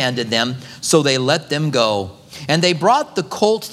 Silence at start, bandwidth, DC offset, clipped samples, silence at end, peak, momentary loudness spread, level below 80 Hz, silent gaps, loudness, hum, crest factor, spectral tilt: 0 s; 16 kHz; under 0.1%; under 0.1%; 0 s; 0 dBFS; 9 LU; -60 dBFS; none; -17 LUFS; none; 18 dB; -4 dB/octave